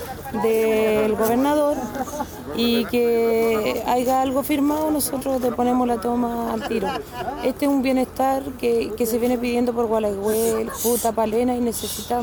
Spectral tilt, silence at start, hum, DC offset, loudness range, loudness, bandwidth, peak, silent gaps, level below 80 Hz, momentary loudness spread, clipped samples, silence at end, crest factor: -4.5 dB/octave; 0 s; none; under 0.1%; 2 LU; -21 LUFS; over 20 kHz; -8 dBFS; none; -46 dBFS; 6 LU; under 0.1%; 0 s; 14 dB